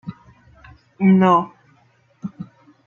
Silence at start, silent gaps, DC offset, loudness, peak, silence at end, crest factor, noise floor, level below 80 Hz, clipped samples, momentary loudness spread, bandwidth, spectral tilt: 0.05 s; none; under 0.1%; -16 LUFS; -2 dBFS; 0.45 s; 18 dB; -58 dBFS; -58 dBFS; under 0.1%; 24 LU; 6.6 kHz; -9 dB/octave